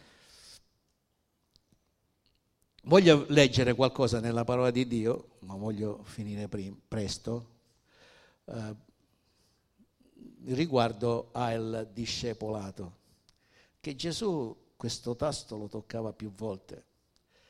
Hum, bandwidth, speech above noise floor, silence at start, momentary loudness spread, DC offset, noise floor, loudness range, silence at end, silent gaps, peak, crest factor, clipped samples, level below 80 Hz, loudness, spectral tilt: none; 14 kHz; 47 dB; 0.45 s; 19 LU; under 0.1%; -77 dBFS; 14 LU; 0.7 s; none; -6 dBFS; 26 dB; under 0.1%; -60 dBFS; -30 LUFS; -5.5 dB/octave